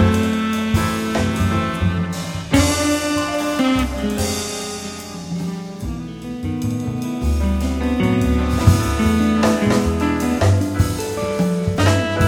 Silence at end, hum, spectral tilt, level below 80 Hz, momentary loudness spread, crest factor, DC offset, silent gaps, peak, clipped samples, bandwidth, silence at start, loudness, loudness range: 0 s; none; -5.5 dB/octave; -28 dBFS; 11 LU; 18 dB; under 0.1%; none; 0 dBFS; under 0.1%; 17 kHz; 0 s; -19 LUFS; 7 LU